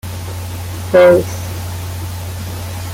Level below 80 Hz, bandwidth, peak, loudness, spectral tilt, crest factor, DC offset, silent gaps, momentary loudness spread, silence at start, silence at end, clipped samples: -40 dBFS; 17 kHz; -2 dBFS; -16 LUFS; -6 dB/octave; 14 dB; under 0.1%; none; 16 LU; 0.05 s; 0 s; under 0.1%